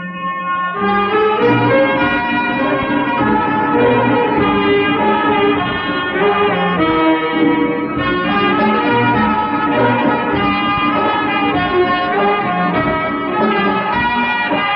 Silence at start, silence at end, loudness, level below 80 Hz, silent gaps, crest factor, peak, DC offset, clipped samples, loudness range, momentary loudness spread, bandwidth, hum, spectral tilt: 0 s; 0 s; -14 LUFS; -42 dBFS; none; 12 dB; -2 dBFS; under 0.1%; under 0.1%; 1 LU; 4 LU; 5.6 kHz; none; -3.5 dB/octave